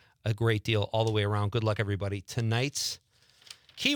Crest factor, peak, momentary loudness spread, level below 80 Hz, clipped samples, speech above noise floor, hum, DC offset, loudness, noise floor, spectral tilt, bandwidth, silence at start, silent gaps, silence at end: 20 dB; -10 dBFS; 12 LU; -62 dBFS; under 0.1%; 25 dB; none; under 0.1%; -30 LUFS; -54 dBFS; -5 dB/octave; 19 kHz; 0.25 s; none; 0 s